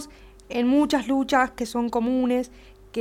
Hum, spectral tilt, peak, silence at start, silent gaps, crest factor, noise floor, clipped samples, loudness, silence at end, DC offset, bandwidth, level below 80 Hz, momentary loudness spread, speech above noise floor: none; -4.5 dB/octave; -6 dBFS; 0 s; none; 18 dB; -45 dBFS; under 0.1%; -23 LUFS; 0 s; under 0.1%; 15 kHz; -50 dBFS; 12 LU; 22 dB